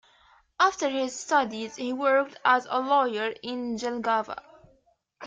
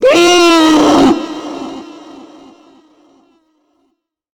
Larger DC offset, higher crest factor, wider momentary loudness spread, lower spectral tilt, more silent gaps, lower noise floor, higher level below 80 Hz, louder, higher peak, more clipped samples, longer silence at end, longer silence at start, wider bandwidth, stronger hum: neither; first, 20 dB vs 12 dB; second, 9 LU vs 21 LU; about the same, -2.5 dB/octave vs -3 dB/octave; neither; about the same, -66 dBFS vs -65 dBFS; second, -70 dBFS vs -44 dBFS; second, -26 LUFS vs -8 LUFS; second, -8 dBFS vs -2 dBFS; neither; second, 0 s vs 2.25 s; first, 0.6 s vs 0 s; second, 9.4 kHz vs 18.5 kHz; neither